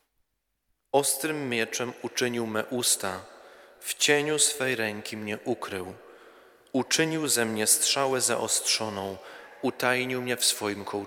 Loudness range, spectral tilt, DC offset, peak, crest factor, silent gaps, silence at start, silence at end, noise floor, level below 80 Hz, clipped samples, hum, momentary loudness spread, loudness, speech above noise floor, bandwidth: 3 LU; -2 dB/octave; under 0.1%; -6 dBFS; 22 dB; none; 0.95 s; 0 s; -77 dBFS; -72 dBFS; under 0.1%; none; 13 LU; -26 LUFS; 49 dB; 19.5 kHz